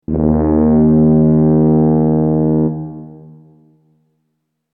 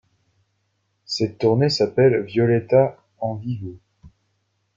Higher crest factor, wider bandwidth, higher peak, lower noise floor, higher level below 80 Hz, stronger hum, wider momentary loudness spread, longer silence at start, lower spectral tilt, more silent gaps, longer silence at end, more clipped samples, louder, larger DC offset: second, 12 dB vs 18 dB; second, 2.1 kHz vs 7.6 kHz; about the same, -2 dBFS vs -4 dBFS; about the same, -70 dBFS vs -71 dBFS; first, -32 dBFS vs -58 dBFS; neither; second, 10 LU vs 13 LU; second, 0.1 s vs 1.1 s; first, -16.5 dB/octave vs -6.5 dB/octave; neither; first, 1.6 s vs 0.7 s; neither; first, -12 LUFS vs -20 LUFS; neither